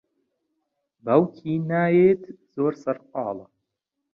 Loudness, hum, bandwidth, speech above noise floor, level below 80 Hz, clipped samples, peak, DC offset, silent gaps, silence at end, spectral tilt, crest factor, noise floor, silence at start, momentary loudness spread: -23 LUFS; none; 6.6 kHz; 59 dB; -68 dBFS; under 0.1%; -4 dBFS; under 0.1%; none; 0.7 s; -10 dB/octave; 20 dB; -81 dBFS; 1.05 s; 16 LU